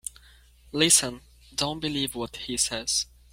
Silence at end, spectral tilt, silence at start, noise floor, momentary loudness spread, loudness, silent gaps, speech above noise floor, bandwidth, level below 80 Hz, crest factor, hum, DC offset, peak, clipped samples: 0.3 s; -1.5 dB/octave; 0.05 s; -55 dBFS; 16 LU; -25 LUFS; none; 28 dB; 16.5 kHz; -52 dBFS; 22 dB; none; under 0.1%; -6 dBFS; under 0.1%